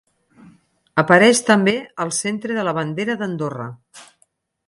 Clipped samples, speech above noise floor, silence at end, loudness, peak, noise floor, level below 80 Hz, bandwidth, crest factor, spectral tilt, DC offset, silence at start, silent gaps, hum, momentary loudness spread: under 0.1%; 45 dB; 0.65 s; -18 LUFS; 0 dBFS; -63 dBFS; -64 dBFS; 11.5 kHz; 20 dB; -4 dB/octave; under 0.1%; 0.95 s; none; none; 14 LU